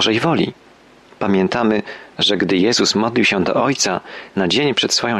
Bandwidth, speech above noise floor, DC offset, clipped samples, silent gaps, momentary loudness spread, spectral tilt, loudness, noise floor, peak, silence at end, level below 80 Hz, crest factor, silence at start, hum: 13 kHz; 29 dB; under 0.1%; under 0.1%; none; 8 LU; -3.5 dB/octave; -17 LUFS; -46 dBFS; -4 dBFS; 0 s; -54 dBFS; 14 dB; 0 s; none